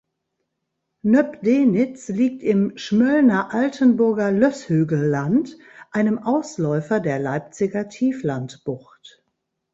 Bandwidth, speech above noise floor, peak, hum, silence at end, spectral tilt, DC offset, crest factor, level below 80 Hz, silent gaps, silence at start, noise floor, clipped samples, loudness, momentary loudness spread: 8 kHz; 58 dB; -4 dBFS; none; 0.95 s; -7.5 dB/octave; under 0.1%; 16 dB; -62 dBFS; none; 1.05 s; -77 dBFS; under 0.1%; -20 LUFS; 10 LU